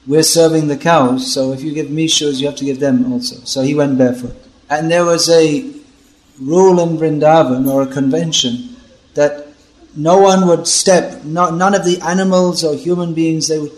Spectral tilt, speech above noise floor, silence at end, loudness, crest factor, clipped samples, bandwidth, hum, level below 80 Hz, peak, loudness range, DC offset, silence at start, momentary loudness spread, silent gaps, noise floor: -4.5 dB/octave; 35 dB; 0 s; -13 LUFS; 14 dB; under 0.1%; 13 kHz; none; -50 dBFS; 0 dBFS; 3 LU; under 0.1%; 0.05 s; 10 LU; none; -48 dBFS